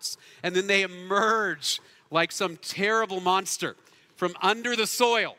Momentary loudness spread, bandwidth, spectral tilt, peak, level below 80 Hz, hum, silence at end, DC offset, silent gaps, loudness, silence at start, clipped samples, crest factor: 9 LU; 16 kHz; -2.5 dB/octave; -6 dBFS; -76 dBFS; none; 0.05 s; under 0.1%; none; -26 LUFS; 0 s; under 0.1%; 22 dB